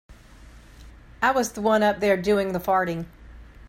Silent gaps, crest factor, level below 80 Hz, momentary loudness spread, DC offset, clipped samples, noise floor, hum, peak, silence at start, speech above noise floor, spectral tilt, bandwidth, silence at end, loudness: none; 18 dB; -48 dBFS; 8 LU; under 0.1%; under 0.1%; -47 dBFS; none; -6 dBFS; 0.1 s; 25 dB; -5 dB/octave; 16 kHz; 0.25 s; -23 LUFS